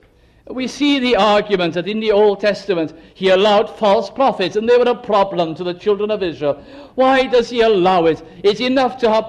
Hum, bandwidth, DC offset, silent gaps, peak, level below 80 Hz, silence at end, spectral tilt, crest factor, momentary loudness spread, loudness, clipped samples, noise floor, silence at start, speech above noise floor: none; 10.5 kHz; under 0.1%; none; -4 dBFS; -48 dBFS; 0 s; -5.5 dB/octave; 12 dB; 8 LU; -16 LUFS; under 0.1%; -46 dBFS; 0.5 s; 30 dB